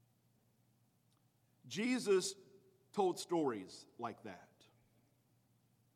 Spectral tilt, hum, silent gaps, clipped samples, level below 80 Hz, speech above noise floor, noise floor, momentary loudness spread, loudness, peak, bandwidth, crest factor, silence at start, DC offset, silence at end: -4 dB/octave; none; none; under 0.1%; under -90 dBFS; 37 dB; -76 dBFS; 19 LU; -39 LUFS; -22 dBFS; 14.5 kHz; 22 dB; 1.65 s; under 0.1%; 1.55 s